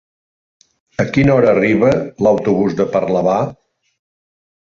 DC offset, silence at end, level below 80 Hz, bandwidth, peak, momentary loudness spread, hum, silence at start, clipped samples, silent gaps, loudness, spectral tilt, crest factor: under 0.1%; 1.25 s; -46 dBFS; 7.4 kHz; 0 dBFS; 8 LU; none; 1 s; under 0.1%; none; -15 LUFS; -8 dB/octave; 16 dB